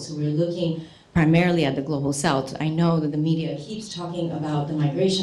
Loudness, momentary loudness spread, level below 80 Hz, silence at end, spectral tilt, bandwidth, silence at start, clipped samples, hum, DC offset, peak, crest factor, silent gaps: -23 LUFS; 11 LU; -50 dBFS; 0 s; -6 dB/octave; 12 kHz; 0 s; under 0.1%; none; under 0.1%; -6 dBFS; 16 dB; none